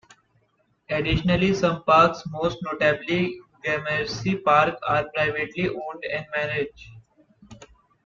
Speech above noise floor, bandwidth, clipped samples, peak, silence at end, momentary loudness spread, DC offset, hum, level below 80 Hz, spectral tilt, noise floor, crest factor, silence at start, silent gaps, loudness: 44 dB; 7.4 kHz; under 0.1%; -4 dBFS; 0.4 s; 11 LU; under 0.1%; none; -46 dBFS; -6 dB/octave; -67 dBFS; 20 dB; 0.9 s; none; -23 LUFS